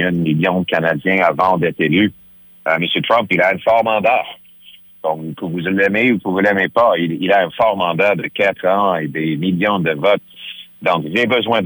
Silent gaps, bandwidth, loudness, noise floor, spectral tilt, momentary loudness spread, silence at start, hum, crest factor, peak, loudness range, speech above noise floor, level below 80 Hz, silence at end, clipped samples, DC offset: none; over 20 kHz; -16 LUFS; -43 dBFS; -7.5 dB/octave; 8 LU; 0 s; none; 14 dB; -2 dBFS; 2 LU; 28 dB; -56 dBFS; 0 s; under 0.1%; under 0.1%